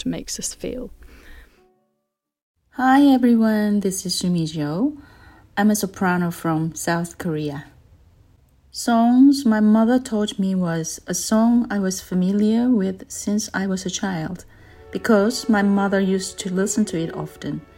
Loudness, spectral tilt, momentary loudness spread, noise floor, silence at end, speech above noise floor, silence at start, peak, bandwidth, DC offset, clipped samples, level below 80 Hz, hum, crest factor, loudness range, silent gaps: -20 LUFS; -5 dB/octave; 14 LU; -78 dBFS; 0.15 s; 58 dB; 0 s; -4 dBFS; 16.5 kHz; under 0.1%; under 0.1%; -50 dBFS; none; 16 dB; 5 LU; 2.42-2.55 s